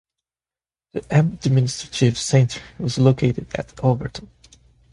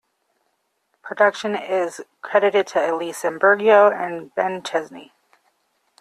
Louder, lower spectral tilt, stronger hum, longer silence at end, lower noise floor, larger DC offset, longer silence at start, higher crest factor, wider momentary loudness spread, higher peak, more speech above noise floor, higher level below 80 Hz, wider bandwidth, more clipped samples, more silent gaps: about the same, -20 LUFS vs -19 LUFS; first, -6 dB/octave vs -4 dB/octave; neither; second, 0.7 s vs 0.95 s; first, under -90 dBFS vs -71 dBFS; neither; about the same, 0.95 s vs 1.05 s; about the same, 18 dB vs 18 dB; about the same, 14 LU vs 13 LU; about the same, -2 dBFS vs -2 dBFS; first, over 70 dB vs 51 dB; first, -48 dBFS vs -72 dBFS; second, 11 kHz vs 13.5 kHz; neither; neither